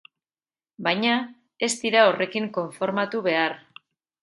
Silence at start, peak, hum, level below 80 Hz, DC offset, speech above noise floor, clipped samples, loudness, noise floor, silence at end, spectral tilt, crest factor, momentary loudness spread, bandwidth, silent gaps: 0.8 s; -4 dBFS; none; -76 dBFS; under 0.1%; over 67 dB; under 0.1%; -23 LUFS; under -90 dBFS; 0.65 s; -3.5 dB/octave; 20 dB; 10 LU; 11.5 kHz; none